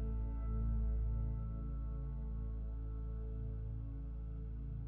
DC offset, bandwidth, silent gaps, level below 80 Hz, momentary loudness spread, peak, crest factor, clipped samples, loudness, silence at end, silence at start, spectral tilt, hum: under 0.1%; 2.1 kHz; none; -40 dBFS; 7 LU; -28 dBFS; 12 dB; under 0.1%; -43 LUFS; 0 s; 0 s; -12 dB/octave; none